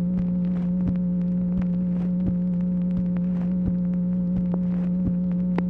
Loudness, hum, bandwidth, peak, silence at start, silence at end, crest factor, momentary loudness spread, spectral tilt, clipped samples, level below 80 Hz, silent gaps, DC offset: -24 LUFS; none; 3 kHz; -10 dBFS; 0 s; 0 s; 14 dB; 0 LU; -12 dB/octave; under 0.1%; -42 dBFS; none; under 0.1%